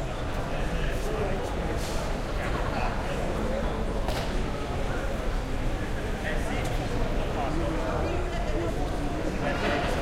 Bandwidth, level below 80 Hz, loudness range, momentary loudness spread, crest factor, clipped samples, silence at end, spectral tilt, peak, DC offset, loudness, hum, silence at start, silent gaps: 15.5 kHz; -32 dBFS; 1 LU; 3 LU; 14 dB; under 0.1%; 0 s; -5.5 dB/octave; -14 dBFS; under 0.1%; -30 LUFS; none; 0 s; none